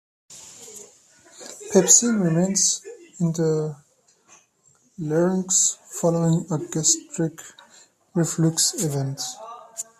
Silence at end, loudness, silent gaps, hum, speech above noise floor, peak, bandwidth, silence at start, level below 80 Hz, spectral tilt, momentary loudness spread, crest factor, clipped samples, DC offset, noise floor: 0.2 s; -21 LUFS; none; none; 40 dB; 0 dBFS; 14.5 kHz; 0.3 s; -66 dBFS; -4 dB/octave; 22 LU; 24 dB; under 0.1%; under 0.1%; -61 dBFS